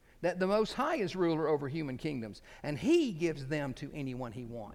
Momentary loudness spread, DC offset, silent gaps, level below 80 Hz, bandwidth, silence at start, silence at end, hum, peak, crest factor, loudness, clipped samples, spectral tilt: 12 LU; under 0.1%; none; -58 dBFS; 14.5 kHz; 0.2 s; 0 s; none; -18 dBFS; 16 dB; -34 LUFS; under 0.1%; -6.5 dB/octave